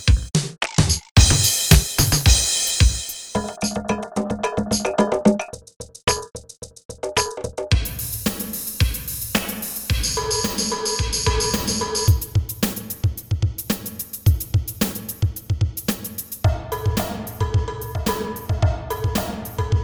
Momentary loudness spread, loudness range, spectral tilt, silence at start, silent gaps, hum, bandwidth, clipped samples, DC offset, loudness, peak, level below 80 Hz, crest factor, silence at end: 11 LU; 7 LU; -4 dB/octave; 0 s; 1.11-1.15 s, 5.76-5.80 s, 6.85-6.89 s; none; over 20 kHz; under 0.1%; under 0.1%; -21 LUFS; 0 dBFS; -28 dBFS; 22 dB; 0 s